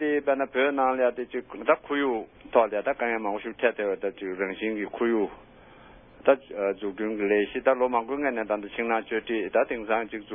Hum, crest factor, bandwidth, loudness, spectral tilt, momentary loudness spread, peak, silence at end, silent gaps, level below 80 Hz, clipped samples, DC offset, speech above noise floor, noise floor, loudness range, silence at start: none; 22 dB; 3.7 kHz; -27 LUFS; -9 dB/octave; 7 LU; -6 dBFS; 0 s; none; -62 dBFS; under 0.1%; under 0.1%; 24 dB; -51 dBFS; 3 LU; 0 s